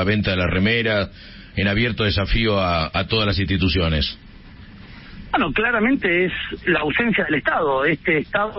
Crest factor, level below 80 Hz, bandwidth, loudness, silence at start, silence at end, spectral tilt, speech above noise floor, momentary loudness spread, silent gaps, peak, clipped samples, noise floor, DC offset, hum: 14 dB; -34 dBFS; 5.8 kHz; -20 LUFS; 0 s; 0 s; -10 dB/octave; 21 dB; 6 LU; none; -6 dBFS; under 0.1%; -41 dBFS; under 0.1%; none